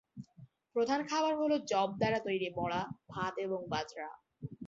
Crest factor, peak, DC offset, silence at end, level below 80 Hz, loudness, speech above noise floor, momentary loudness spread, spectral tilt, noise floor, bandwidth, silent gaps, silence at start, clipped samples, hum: 18 dB; -18 dBFS; under 0.1%; 0 s; -68 dBFS; -35 LUFS; 25 dB; 17 LU; -4 dB/octave; -60 dBFS; 7.8 kHz; none; 0.15 s; under 0.1%; none